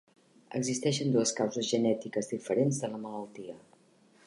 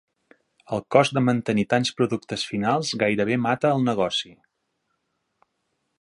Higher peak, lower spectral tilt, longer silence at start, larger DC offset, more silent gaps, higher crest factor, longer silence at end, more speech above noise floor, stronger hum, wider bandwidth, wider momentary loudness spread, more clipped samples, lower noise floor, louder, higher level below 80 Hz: second, -14 dBFS vs -2 dBFS; about the same, -5 dB/octave vs -5.5 dB/octave; second, 0.5 s vs 0.7 s; neither; neither; about the same, 18 dB vs 22 dB; second, 0.7 s vs 1.7 s; second, 32 dB vs 53 dB; neither; about the same, 11.5 kHz vs 11.5 kHz; first, 15 LU vs 8 LU; neither; second, -63 dBFS vs -75 dBFS; second, -31 LUFS vs -23 LUFS; second, -76 dBFS vs -62 dBFS